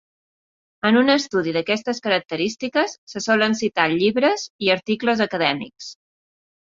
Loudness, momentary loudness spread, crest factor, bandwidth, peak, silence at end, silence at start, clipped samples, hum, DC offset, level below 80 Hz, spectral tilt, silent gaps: -20 LUFS; 8 LU; 18 dB; 7.6 kHz; -2 dBFS; 0.75 s; 0.85 s; under 0.1%; none; under 0.1%; -64 dBFS; -4 dB/octave; 2.98-3.07 s, 4.50-4.59 s